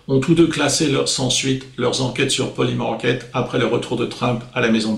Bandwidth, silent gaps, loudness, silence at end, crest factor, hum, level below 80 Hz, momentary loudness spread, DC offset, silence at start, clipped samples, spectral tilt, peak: 15 kHz; none; -19 LUFS; 0 s; 14 dB; none; -46 dBFS; 6 LU; under 0.1%; 0.1 s; under 0.1%; -4.5 dB/octave; -4 dBFS